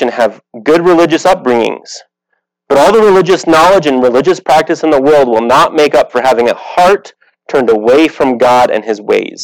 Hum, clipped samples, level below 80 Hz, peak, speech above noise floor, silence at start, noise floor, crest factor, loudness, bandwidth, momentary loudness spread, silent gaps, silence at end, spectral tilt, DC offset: none; under 0.1%; -44 dBFS; -2 dBFS; 58 dB; 0 s; -67 dBFS; 8 dB; -9 LUFS; 18.5 kHz; 8 LU; none; 0 s; -4.5 dB/octave; under 0.1%